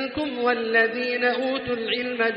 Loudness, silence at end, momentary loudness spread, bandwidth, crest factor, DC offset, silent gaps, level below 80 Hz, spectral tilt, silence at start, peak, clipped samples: -23 LUFS; 0 s; 5 LU; 5.6 kHz; 16 dB; under 0.1%; none; -58 dBFS; -0.5 dB/octave; 0 s; -8 dBFS; under 0.1%